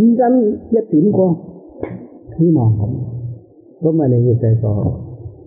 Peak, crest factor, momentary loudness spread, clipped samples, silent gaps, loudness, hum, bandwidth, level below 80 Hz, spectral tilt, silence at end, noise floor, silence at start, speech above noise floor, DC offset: -4 dBFS; 12 dB; 18 LU; under 0.1%; none; -15 LUFS; none; 2.3 kHz; -44 dBFS; -10.5 dB/octave; 0.15 s; -36 dBFS; 0 s; 22 dB; under 0.1%